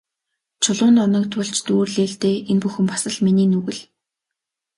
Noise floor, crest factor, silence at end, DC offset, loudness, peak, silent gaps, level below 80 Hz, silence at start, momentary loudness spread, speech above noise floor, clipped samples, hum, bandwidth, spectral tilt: -84 dBFS; 16 dB; 0.95 s; under 0.1%; -19 LUFS; -4 dBFS; none; -62 dBFS; 0.6 s; 7 LU; 65 dB; under 0.1%; none; 11.5 kHz; -5 dB/octave